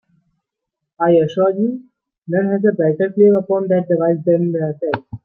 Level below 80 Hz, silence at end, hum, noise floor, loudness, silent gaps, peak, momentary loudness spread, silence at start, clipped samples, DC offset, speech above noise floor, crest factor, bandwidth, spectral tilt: -62 dBFS; 0.1 s; none; -80 dBFS; -16 LUFS; 2.18-2.22 s; -2 dBFS; 9 LU; 1 s; under 0.1%; under 0.1%; 64 dB; 14 dB; 6.4 kHz; -10 dB/octave